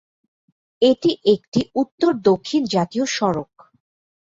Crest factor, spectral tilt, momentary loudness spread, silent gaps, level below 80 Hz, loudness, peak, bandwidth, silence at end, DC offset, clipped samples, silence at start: 18 dB; -5.5 dB/octave; 6 LU; 1.48-1.52 s, 1.92-1.98 s; -58 dBFS; -20 LUFS; -2 dBFS; 7.8 kHz; 0.8 s; under 0.1%; under 0.1%; 0.8 s